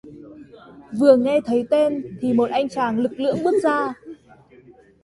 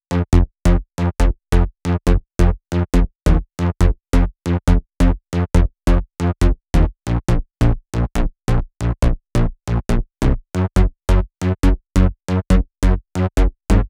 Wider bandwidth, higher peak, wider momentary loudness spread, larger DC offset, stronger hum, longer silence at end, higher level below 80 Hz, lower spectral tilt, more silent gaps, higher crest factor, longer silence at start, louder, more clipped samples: about the same, 11.5 kHz vs 12 kHz; about the same, -2 dBFS vs -2 dBFS; first, 10 LU vs 5 LU; neither; neither; first, 0.9 s vs 0 s; second, -60 dBFS vs -18 dBFS; about the same, -6.5 dB/octave vs -7 dB/octave; neither; about the same, 18 dB vs 14 dB; about the same, 0.05 s vs 0.1 s; about the same, -20 LUFS vs -19 LUFS; neither